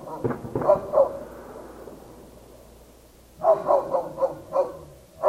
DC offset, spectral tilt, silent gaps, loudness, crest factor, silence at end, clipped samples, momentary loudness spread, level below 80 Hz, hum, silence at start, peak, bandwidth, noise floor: under 0.1%; -7.5 dB/octave; none; -24 LUFS; 20 dB; 0 s; under 0.1%; 22 LU; -54 dBFS; none; 0 s; -6 dBFS; 15.5 kHz; -51 dBFS